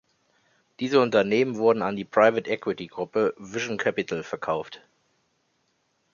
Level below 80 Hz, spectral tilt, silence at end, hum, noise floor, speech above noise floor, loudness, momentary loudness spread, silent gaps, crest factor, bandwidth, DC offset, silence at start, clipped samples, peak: -68 dBFS; -5.5 dB/octave; 1.35 s; none; -71 dBFS; 47 dB; -25 LUFS; 11 LU; none; 22 dB; 7.2 kHz; under 0.1%; 0.8 s; under 0.1%; -4 dBFS